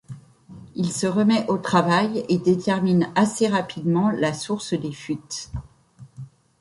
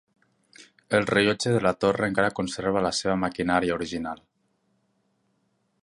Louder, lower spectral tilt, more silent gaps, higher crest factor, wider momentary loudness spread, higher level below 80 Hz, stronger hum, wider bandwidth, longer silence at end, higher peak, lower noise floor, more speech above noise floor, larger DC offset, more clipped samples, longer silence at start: first, -22 LUFS vs -25 LUFS; about the same, -5.5 dB/octave vs -5 dB/octave; neither; about the same, 18 dB vs 22 dB; first, 18 LU vs 8 LU; about the same, -52 dBFS vs -54 dBFS; neither; about the same, 11.5 kHz vs 11.5 kHz; second, 0.35 s vs 1.7 s; about the same, -4 dBFS vs -6 dBFS; second, -48 dBFS vs -71 dBFS; second, 27 dB vs 47 dB; neither; neither; second, 0.1 s vs 0.6 s